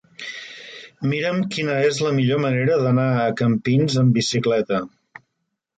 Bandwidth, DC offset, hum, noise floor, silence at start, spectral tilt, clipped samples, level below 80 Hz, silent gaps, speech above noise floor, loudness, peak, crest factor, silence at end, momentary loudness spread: 9.2 kHz; under 0.1%; none; -77 dBFS; 0.2 s; -6 dB/octave; under 0.1%; -60 dBFS; none; 58 dB; -20 LUFS; -8 dBFS; 14 dB; 0.9 s; 15 LU